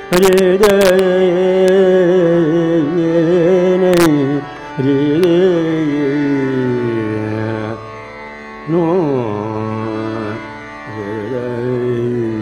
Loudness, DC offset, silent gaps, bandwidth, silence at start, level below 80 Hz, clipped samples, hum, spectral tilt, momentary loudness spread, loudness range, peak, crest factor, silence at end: -14 LUFS; under 0.1%; none; 16 kHz; 0 s; -46 dBFS; under 0.1%; none; -6.5 dB/octave; 15 LU; 8 LU; 0 dBFS; 14 dB; 0 s